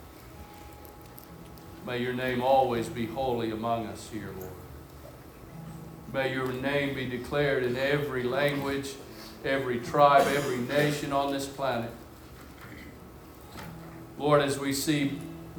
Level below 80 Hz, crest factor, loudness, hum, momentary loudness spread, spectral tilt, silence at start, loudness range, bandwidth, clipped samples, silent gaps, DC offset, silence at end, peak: -54 dBFS; 22 dB; -28 LUFS; none; 22 LU; -5 dB/octave; 0 s; 8 LU; over 20 kHz; under 0.1%; none; under 0.1%; 0 s; -8 dBFS